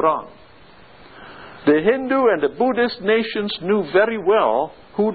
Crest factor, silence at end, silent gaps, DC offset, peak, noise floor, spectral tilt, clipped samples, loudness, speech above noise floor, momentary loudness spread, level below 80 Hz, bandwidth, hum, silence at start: 18 dB; 0 s; none; 0.3%; -2 dBFS; -47 dBFS; -10.5 dB/octave; under 0.1%; -19 LUFS; 29 dB; 8 LU; -58 dBFS; 4.8 kHz; none; 0 s